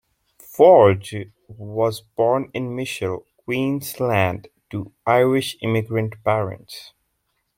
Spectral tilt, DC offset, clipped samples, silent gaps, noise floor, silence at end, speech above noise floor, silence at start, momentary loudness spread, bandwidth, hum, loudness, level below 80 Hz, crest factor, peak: -6 dB/octave; under 0.1%; under 0.1%; none; -72 dBFS; 0.7 s; 52 dB; 0.5 s; 20 LU; 16.5 kHz; none; -20 LUFS; -60 dBFS; 18 dB; -2 dBFS